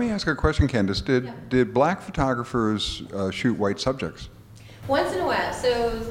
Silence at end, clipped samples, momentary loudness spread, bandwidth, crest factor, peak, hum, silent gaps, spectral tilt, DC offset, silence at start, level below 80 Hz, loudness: 0 s; under 0.1%; 7 LU; 16 kHz; 18 dB; -6 dBFS; none; none; -6 dB/octave; under 0.1%; 0 s; -38 dBFS; -24 LUFS